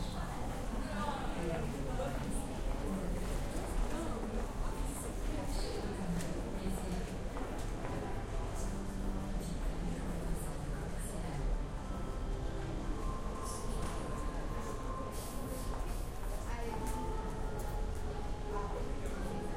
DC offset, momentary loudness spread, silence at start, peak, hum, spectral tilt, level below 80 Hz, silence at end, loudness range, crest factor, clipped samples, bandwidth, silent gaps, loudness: under 0.1%; 3 LU; 0 s; -24 dBFS; none; -5.5 dB/octave; -40 dBFS; 0 s; 2 LU; 14 dB; under 0.1%; 16 kHz; none; -41 LUFS